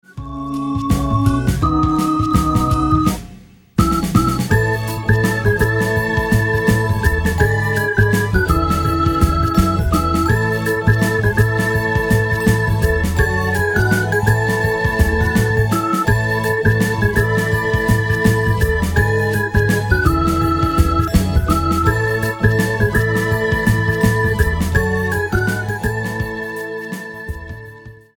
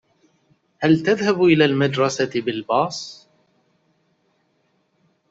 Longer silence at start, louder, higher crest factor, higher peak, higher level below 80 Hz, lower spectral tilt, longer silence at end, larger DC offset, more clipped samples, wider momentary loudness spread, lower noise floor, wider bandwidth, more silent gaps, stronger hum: second, 0.15 s vs 0.8 s; first, -16 LUFS vs -19 LUFS; about the same, 16 dB vs 18 dB; first, 0 dBFS vs -4 dBFS; first, -26 dBFS vs -62 dBFS; about the same, -6.5 dB/octave vs -5.5 dB/octave; second, 0.2 s vs 2.15 s; neither; neither; second, 5 LU vs 10 LU; second, -41 dBFS vs -66 dBFS; first, 19 kHz vs 8 kHz; neither; neither